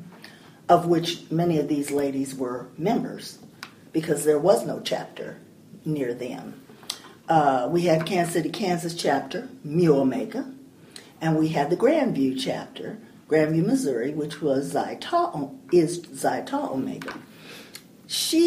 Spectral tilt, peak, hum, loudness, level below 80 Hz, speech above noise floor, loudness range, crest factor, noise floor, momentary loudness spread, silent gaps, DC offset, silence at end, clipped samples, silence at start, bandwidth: -5.5 dB/octave; -6 dBFS; none; -25 LUFS; -66 dBFS; 24 dB; 3 LU; 20 dB; -47 dBFS; 20 LU; none; under 0.1%; 0 s; under 0.1%; 0 s; 15.5 kHz